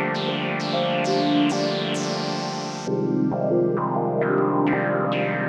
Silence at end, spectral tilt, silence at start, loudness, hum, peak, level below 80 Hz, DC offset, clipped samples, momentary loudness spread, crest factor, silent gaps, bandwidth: 0 s; -5.5 dB/octave; 0 s; -23 LUFS; none; -10 dBFS; -68 dBFS; under 0.1%; under 0.1%; 5 LU; 14 dB; none; 10.5 kHz